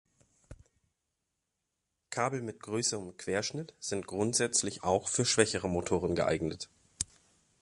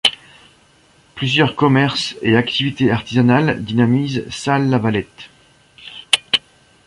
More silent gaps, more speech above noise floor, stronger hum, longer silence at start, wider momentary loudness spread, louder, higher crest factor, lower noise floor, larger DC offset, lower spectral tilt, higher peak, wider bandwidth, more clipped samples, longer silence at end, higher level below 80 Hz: neither; first, 53 dB vs 36 dB; neither; first, 0.5 s vs 0.05 s; about the same, 11 LU vs 9 LU; second, -32 LUFS vs -17 LUFS; first, 26 dB vs 18 dB; first, -85 dBFS vs -52 dBFS; neither; second, -3.5 dB/octave vs -5.5 dB/octave; second, -8 dBFS vs 0 dBFS; about the same, 11.5 kHz vs 11.5 kHz; neither; about the same, 0.55 s vs 0.5 s; second, -58 dBFS vs -50 dBFS